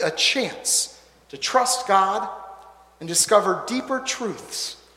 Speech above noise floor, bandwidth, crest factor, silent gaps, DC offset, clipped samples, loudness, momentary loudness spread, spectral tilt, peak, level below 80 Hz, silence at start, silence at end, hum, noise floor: 24 dB; 16.5 kHz; 20 dB; none; under 0.1%; under 0.1%; -21 LUFS; 12 LU; -1.5 dB/octave; -4 dBFS; -64 dBFS; 0 s; 0.2 s; none; -46 dBFS